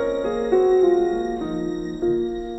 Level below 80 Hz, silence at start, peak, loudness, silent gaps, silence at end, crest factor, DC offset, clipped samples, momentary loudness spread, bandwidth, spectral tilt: -44 dBFS; 0 s; -8 dBFS; -21 LUFS; none; 0 s; 14 dB; under 0.1%; under 0.1%; 9 LU; 8 kHz; -7 dB/octave